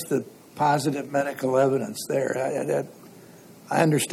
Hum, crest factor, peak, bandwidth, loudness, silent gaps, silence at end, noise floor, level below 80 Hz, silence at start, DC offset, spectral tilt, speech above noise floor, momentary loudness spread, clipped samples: none; 18 dB; -8 dBFS; 16.5 kHz; -25 LUFS; none; 0 s; -48 dBFS; -72 dBFS; 0 s; under 0.1%; -5.5 dB/octave; 24 dB; 7 LU; under 0.1%